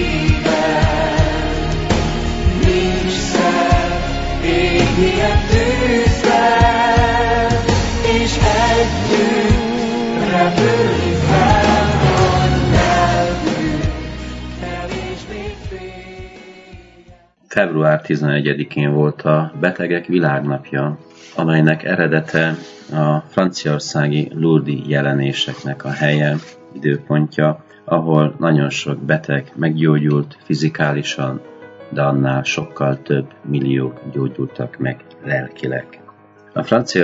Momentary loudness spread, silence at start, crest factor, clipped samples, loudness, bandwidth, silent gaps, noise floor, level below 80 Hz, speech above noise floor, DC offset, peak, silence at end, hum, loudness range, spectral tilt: 11 LU; 0 s; 16 dB; under 0.1%; -16 LUFS; 8 kHz; none; -46 dBFS; -28 dBFS; 29 dB; under 0.1%; 0 dBFS; 0 s; none; 7 LU; -6 dB/octave